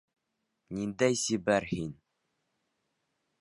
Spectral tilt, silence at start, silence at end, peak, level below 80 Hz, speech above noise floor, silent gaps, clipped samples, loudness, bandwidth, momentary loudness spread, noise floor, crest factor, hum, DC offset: -4.5 dB/octave; 0.7 s; 1.5 s; -12 dBFS; -62 dBFS; 52 dB; none; under 0.1%; -30 LUFS; 11.5 kHz; 12 LU; -82 dBFS; 22 dB; none; under 0.1%